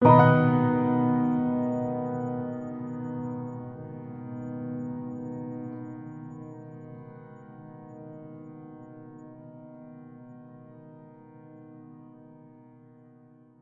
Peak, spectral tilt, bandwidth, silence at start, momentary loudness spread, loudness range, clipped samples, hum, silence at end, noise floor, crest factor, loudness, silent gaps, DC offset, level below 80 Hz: -4 dBFS; -10.5 dB/octave; 4 kHz; 0 s; 24 LU; 21 LU; under 0.1%; none; 1.15 s; -55 dBFS; 26 dB; -28 LUFS; none; under 0.1%; -66 dBFS